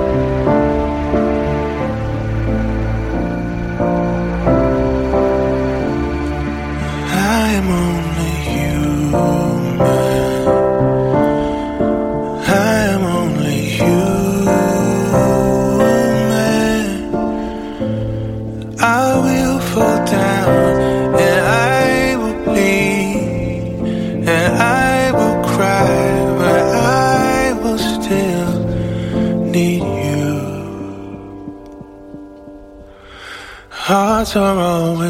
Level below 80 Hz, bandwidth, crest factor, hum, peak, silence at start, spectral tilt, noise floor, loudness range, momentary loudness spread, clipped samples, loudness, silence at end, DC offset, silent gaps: -30 dBFS; 16.5 kHz; 14 dB; none; 0 dBFS; 0 s; -6 dB/octave; -37 dBFS; 5 LU; 9 LU; under 0.1%; -15 LUFS; 0 s; under 0.1%; none